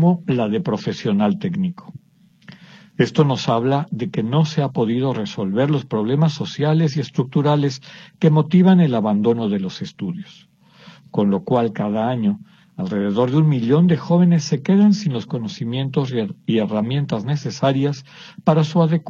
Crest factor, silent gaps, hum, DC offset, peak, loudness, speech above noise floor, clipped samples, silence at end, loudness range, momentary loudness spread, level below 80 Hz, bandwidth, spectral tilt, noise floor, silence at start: 16 dB; none; none; under 0.1%; -2 dBFS; -19 LUFS; 33 dB; under 0.1%; 0 s; 4 LU; 10 LU; -62 dBFS; 7.2 kHz; -7.5 dB/octave; -51 dBFS; 0 s